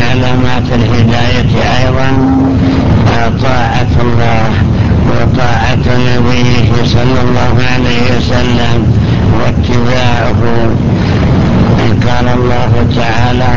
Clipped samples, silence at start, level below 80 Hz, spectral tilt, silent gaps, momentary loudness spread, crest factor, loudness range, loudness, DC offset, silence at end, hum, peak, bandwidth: 0.3%; 0 s; -18 dBFS; -7 dB/octave; none; 2 LU; 10 dB; 1 LU; -10 LUFS; 20%; 0 s; none; 0 dBFS; 7.4 kHz